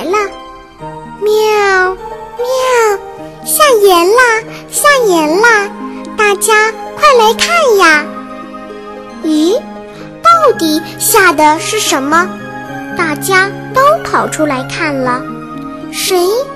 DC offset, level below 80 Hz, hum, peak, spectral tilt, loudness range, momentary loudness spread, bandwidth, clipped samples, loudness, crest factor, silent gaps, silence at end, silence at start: 0.3%; -44 dBFS; none; 0 dBFS; -2.5 dB/octave; 4 LU; 19 LU; 16 kHz; under 0.1%; -10 LUFS; 12 dB; none; 0 s; 0 s